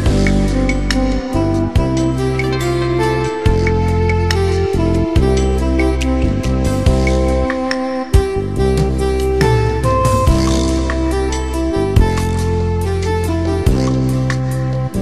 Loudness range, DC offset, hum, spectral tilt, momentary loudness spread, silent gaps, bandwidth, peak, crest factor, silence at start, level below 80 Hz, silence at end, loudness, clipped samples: 1 LU; 1%; none; -6.5 dB/octave; 4 LU; none; 13 kHz; 0 dBFS; 14 dB; 0 s; -20 dBFS; 0 s; -16 LUFS; under 0.1%